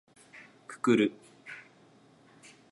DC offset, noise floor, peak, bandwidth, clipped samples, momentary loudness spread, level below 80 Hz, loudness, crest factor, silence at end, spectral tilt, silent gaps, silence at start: under 0.1%; -60 dBFS; -12 dBFS; 11.5 kHz; under 0.1%; 26 LU; -78 dBFS; -28 LUFS; 22 dB; 1.1 s; -5.5 dB/octave; none; 0.7 s